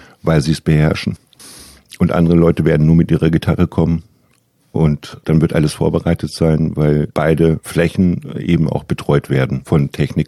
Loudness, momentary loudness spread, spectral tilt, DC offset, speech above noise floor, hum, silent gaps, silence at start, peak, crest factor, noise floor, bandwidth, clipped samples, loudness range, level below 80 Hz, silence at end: -15 LUFS; 7 LU; -7.5 dB/octave; under 0.1%; 43 dB; none; none; 0.25 s; -2 dBFS; 14 dB; -57 dBFS; 13 kHz; under 0.1%; 2 LU; -32 dBFS; 0 s